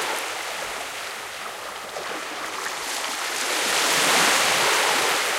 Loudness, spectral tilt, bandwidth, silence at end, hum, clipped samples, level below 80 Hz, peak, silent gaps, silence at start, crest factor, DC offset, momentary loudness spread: -22 LUFS; 0 dB/octave; 16.5 kHz; 0 s; none; under 0.1%; -64 dBFS; -6 dBFS; none; 0 s; 18 dB; under 0.1%; 14 LU